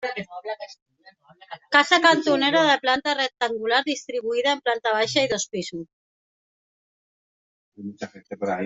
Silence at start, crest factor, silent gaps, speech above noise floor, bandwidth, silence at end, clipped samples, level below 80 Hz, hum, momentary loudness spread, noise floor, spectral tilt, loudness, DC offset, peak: 0 s; 22 dB; 0.82-0.86 s, 5.93-7.72 s; 32 dB; 8.2 kHz; 0 s; under 0.1%; -68 dBFS; none; 20 LU; -55 dBFS; -2.5 dB/octave; -21 LUFS; under 0.1%; -2 dBFS